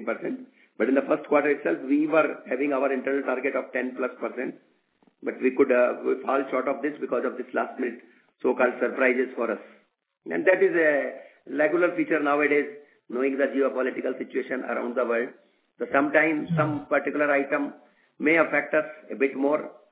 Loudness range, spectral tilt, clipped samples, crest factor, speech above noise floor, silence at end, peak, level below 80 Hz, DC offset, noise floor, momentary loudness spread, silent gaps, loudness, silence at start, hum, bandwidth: 3 LU; -10 dB/octave; under 0.1%; 20 dB; 40 dB; 0.2 s; -6 dBFS; -76 dBFS; under 0.1%; -65 dBFS; 11 LU; none; -25 LUFS; 0 s; none; 4 kHz